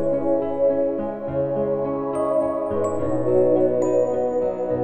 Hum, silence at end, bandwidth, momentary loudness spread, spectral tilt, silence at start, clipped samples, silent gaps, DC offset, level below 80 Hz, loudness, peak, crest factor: none; 0 s; 9.2 kHz; 6 LU; -8.5 dB/octave; 0 s; under 0.1%; none; under 0.1%; -50 dBFS; -22 LUFS; -8 dBFS; 14 dB